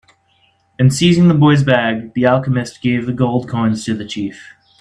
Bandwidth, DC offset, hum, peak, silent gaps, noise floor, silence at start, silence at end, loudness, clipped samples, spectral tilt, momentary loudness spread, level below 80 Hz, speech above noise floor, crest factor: 12 kHz; under 0.1%; none; 0 dBFS; none; -57 dBFS; 0.8 s; 0.35 s; -15 LUFS; under 0.1%; -6.5 dB/octave; 11 LU; -50 dBFS; 43 dB; 14 dB